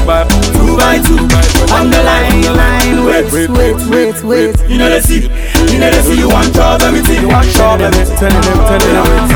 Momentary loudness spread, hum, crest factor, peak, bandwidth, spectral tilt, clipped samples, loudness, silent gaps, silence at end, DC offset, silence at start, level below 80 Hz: 3 LU; none; 8 dB; 0 dBFS; over 20 kHz; -5 dB/octave; 0.6%; -9 LUFS; none; 0 s; under 0.1%; 0 s; -12 dBFS